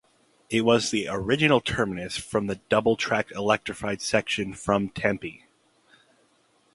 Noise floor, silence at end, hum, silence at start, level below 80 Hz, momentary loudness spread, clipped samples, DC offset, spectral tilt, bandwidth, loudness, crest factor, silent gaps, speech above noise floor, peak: -65 dBFS; 1.4 s; none; 0.5 s; -54 dBFS; 7 LU; under 0.1%; under 0.1%; -4.5 dB/octave; 11.5 kHz; -25 LUFS; 22 dB; none; 40 dB; -4 dBFS